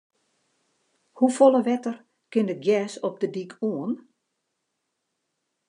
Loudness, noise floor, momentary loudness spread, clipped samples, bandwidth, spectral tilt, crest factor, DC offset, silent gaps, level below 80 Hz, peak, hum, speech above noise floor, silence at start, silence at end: -24 LUFS; -79 dBFS; 14 LU; under 0.1%; 11 kHz; -6 dB/octave; 22 dB; under 0.1%; none; -90 dBFS; -4 dBFS; none; 56 dB; 1.15 s; 1.7 s